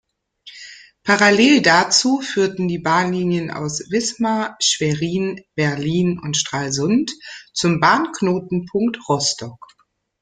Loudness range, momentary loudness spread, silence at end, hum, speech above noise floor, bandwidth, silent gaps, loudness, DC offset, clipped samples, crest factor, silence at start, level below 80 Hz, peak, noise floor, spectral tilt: 4 LU; 14 LU; 0.65 s; none; 28 dB; 9.6 kHz; none; -18 LUFS; under 0.1%; under 0.1%; 18 dB; 0.45 s; -56 dBFS; 0 dBFS; -46 dBFS; -4 dB/octave